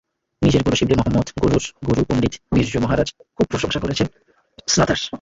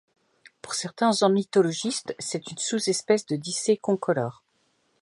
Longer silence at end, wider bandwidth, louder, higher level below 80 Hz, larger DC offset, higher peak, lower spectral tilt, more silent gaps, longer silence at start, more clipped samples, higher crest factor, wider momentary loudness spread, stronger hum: second, 0.05 s vs 0.7 s; second, 8 kHz vs 11.5 kHz; first, -20 LUFS vs -25 LUFS; first, -36 dBFS vs -74 dBFS; neither; first, -4 dBFS vs -8 dBFS; about the same, -5 dB/octave vs -4 dB/octave; neither; second, 0.4 s vs 0.65 s; neither; about the same, 16 dB vs 20 dB; second, 6 LU vs 10 LU; neither